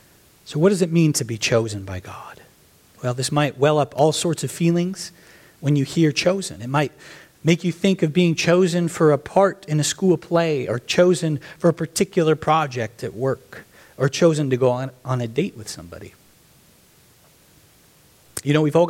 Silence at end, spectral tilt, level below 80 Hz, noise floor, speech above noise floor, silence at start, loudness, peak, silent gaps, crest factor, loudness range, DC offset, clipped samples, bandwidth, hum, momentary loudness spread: 0 s; -5.5 dB/octave; -58 dBFS; -54 dBFS; 34 dB; 0.45 s; -20 LUFS; -4 dBFS; none; 18 dB; 5 LU; under 0.1%; under 0.1%; 16 kHz; none; 13 LU